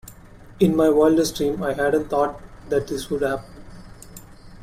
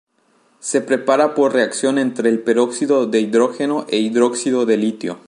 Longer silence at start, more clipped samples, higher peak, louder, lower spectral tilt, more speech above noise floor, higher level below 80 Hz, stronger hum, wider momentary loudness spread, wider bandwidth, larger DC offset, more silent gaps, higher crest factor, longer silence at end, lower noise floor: second, 0.05 s vs 0.65 s; neither; second, -6 dBFS vs -2 dBFS; second, -21 LUFS vs -17 LUFS; first, -5.5 dB/octave vs -4 dB/octave; second, 24 dB vs 42 dB; first, -46 dBFS vs -74 dBFS; neither; first, 21 LU vs 5 LU; first, 16 kHz vs 11.5 kHz; neither; neither; about the same, 18 dB vs 16 dB; about the same, 0 s vs 0.1 s; second, -44 dBFS vs -59 dBFS